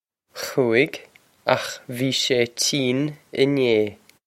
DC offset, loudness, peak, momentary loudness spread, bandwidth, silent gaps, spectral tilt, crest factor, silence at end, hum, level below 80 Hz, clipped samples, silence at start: under 0.1%; -22 LUFS; -2 dBFS; 10 LU; 16.5 kHz; none; -4 dB/octave; 22 dB; 0.3 s; none; -66 dBFS; under 0.1%; 0.35 s